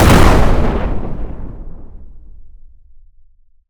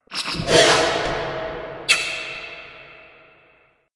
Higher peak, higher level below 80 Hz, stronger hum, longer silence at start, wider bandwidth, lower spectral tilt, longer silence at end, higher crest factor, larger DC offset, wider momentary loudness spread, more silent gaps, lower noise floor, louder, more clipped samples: about the same, 0 dBFS vs -2 dBFS; first, -18 dBFS vs -46 dBFS; neither; about the same, 0 s vs 0.1 s; first, over 20 kHz vs 11.5 kHz; first, -6 dB/octave vs -2 dB/octave; first, 1.15 s vs 0.9 s; second, 14 dB vs 20 dB; neither; first, 24 LU vs 19 LU; neither; second, -45 dBFS vs -58 dBFS; first, -15 LUFS vs -19 LUFS; neither